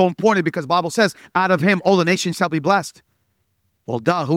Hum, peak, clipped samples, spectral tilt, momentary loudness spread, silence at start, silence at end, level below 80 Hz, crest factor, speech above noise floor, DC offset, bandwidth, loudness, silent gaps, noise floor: none; -2 dBFS; under 0.1%; -5.5 dB/octave; 6 LU; 0 s; 0 s; -64 dBFS; 16 dB; 50 dB; under 0.1%; 15.5 kHz; -18 LUFS; none; -68 dBFS